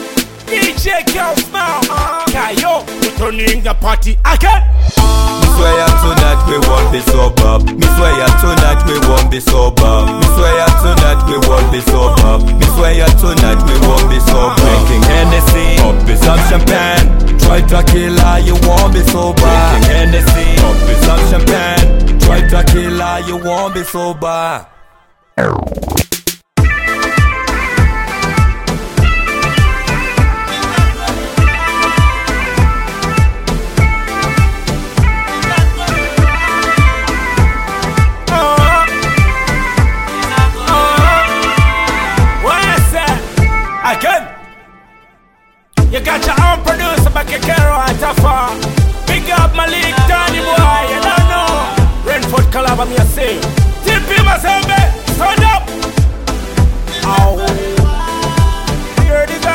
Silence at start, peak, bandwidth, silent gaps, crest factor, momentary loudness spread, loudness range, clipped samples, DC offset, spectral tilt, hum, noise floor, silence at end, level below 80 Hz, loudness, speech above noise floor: 0 s; 0 dBFS; 17 kHz; none; 10 dB; 6 LU; 4 LU; 0.2%; under 0.1%; -5 dB/octave; none; -49 dBFS; 0 s; -12 dBFS; -11 LUFS; 42 dB